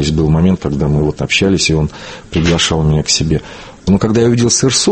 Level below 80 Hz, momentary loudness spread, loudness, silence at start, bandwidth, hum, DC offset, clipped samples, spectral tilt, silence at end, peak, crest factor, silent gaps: -28 dBFS; 9 LU; -13 LUFS; 0 s; 8.8 kHz; none; under 0.1%; under 0.1%; -4.5 dB/octave; 0 s; 0 dBFS; 12 dB; none